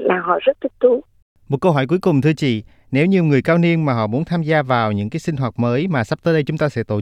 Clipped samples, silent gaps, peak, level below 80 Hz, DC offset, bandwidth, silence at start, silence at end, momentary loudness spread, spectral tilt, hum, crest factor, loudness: under 0.1%; 1.22-1.36 s; -2 dBFS; -52 dBFS; under 0.1%; 10.5 kHz; 0 s; 0 s; 7 LU; -8 dB/octave; none; 16 dB; -18 LUFS